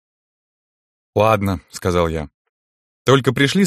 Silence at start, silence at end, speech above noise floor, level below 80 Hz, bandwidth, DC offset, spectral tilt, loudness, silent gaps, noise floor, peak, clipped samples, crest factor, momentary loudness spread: 1.15 s; 0 s; over 74 dB; -42 dBFS; 15.5 kHz; under 0.1%; -5.5 dB/octave; -18 LUFS; 2.34-3.05 s; under -90 dBFS; 0 dBFS; under 0.1%; 18 dB; 9 LU